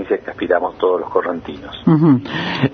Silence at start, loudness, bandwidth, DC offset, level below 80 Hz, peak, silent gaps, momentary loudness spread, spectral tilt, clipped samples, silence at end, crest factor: 0 s; -17 LUFS; 6.4 kHz; under 0.1%; -50 dBFS; 0 dBFS; none; 11 LU; -8.5 dB/octave; under 0.1%; 0 s; 16 dB